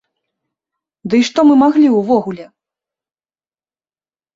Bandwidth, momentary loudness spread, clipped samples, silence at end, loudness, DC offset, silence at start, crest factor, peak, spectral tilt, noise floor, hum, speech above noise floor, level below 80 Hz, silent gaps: 7.6 kHz; 19 LU; under 0.1%; 1.9 s; -12 LUFS; under 0.1%; 1.05 s; 14 dB; -2 dBFS; -5.5 dB/octave; under -90 dBFS; none; over 78 dB; -60 dBFS; none